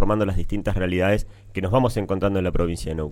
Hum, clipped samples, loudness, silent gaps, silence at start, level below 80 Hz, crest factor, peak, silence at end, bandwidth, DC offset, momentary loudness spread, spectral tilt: none; under 0.1%; -23 LUFS; none; 0 s; -30 dBFS; 16 dB; -6 dBFS; 0 s; 15 kHz; under 0.1%; 6 LU; -7 dB/octave